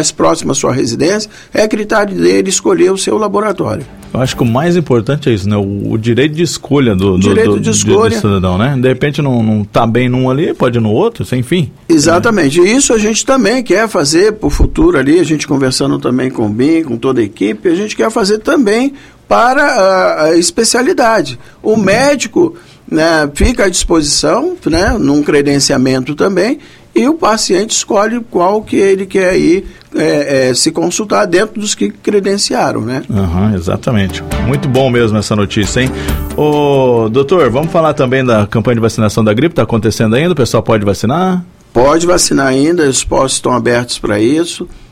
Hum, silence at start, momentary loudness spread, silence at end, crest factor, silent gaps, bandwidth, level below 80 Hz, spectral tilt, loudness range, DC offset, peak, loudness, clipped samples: none; 0 s; 6 LU; 0.05 s; 10 dB; none; 16 kHz; -28 dBFS; -5 dB/octave; 3 LU; under 0.1%; 0 dBFS; -11 LUFS; under 0.1%